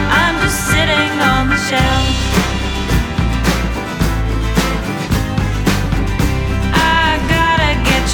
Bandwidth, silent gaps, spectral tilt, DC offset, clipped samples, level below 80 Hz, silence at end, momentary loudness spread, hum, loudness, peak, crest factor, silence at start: 19.5 kHz; none; -4.5 dB/octave; under 0.1%; under 0.1%; -20 dBFS; 0 s; 6 LU; none; -15 LUFS; 0 dBFS; 14 dB; 0 s